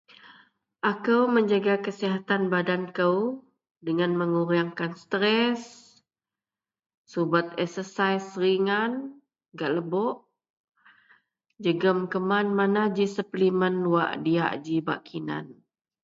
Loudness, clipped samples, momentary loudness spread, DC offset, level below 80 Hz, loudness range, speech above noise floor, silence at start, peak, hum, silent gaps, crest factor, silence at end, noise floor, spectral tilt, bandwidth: -26 LUFS; under 0.1%; 10 LU; under 0.1%; -74 dBFS; 4 LU; over 65 dB; 0.25 s; -8 dBFS; none; 3.71-3.75 s, 6.97-7.05 s, 10.50-10.68 s; 20 dB; 0.5 s; under -90 dBFS; -6.5 dB/octave; 7.8 kHz